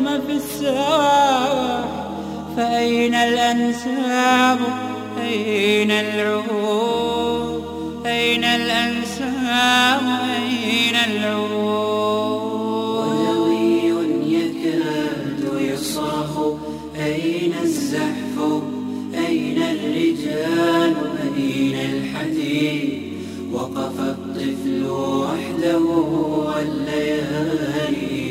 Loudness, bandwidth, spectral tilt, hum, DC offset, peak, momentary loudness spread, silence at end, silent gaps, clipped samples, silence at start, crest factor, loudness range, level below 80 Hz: -20 LUFS; 16 kHz; -4.5 dB/octave; none; under 0.1%; -4 dBFS; 9 LU; 0 s; none; under 0.1%; 0 s; 16 dB; 5 LU; -52 dBFS